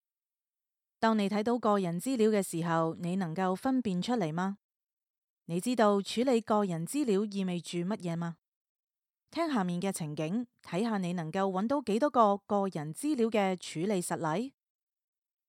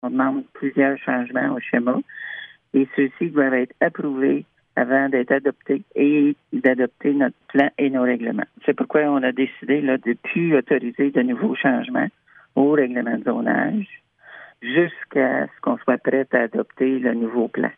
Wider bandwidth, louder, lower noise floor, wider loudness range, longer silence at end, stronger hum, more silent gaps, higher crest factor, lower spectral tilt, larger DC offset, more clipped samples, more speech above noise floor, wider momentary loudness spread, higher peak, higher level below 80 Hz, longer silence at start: first, 16 kHz vs 3.7 kHz; second, -31 LUFS vs -21 LUFS; first, under -90 dBFS vs -45 dBFS; about the same, 4 LU vs 2 LU; first, 1 s vs 0.05 s; neither; first, 4.64-4.69 s, 4.93-4.97 s, 5.10-5.37 s, 8.48-8.75 s vs none; about the same, 20 dB vs 18 dB; second, -6 dB/octave vs -9.5 dB/octave; neither; neither; first, over 60 dB vs 24 dB; about the same, 8 LU vs 6 LU; second, -12 dBFS vs -2 dBFS; about the same, -78 dBFS vs -76 dBFS; first, 1 s vs 0.05 s